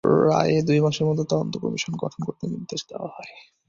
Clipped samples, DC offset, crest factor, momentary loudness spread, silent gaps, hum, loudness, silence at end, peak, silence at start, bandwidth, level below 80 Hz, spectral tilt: under 0.1%; under 0.1%; 18 dB; 16 LU; none; none; -23 LUFS; 0.25 s; -6 dBFS; 0.05 s; 7.6 kHz; -58 dBFS; -6 dB/octave